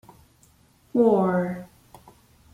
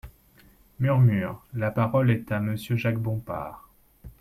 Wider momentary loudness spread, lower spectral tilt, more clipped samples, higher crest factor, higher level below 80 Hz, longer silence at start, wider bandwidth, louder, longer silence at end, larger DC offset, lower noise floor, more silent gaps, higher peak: about the same, 13 LU vs 12 LU; about the same, -9 dB/octave vs -8.5 dB/octave; neither; about the same, 18 dB vs 16 dB; second, -62 dBFS vs -52 dBFS; first, 0.95 s vs 0.05 s; about the same, 14.5 kHz vs 14 kHz; first, -23 LUFS vs -26 LUFS; first, 0.9 s vs 0.1 s; neither; about the same, -59 dBFS vs -57 dBFS; neither; about the same, -8 dBFS vs -10 dBFS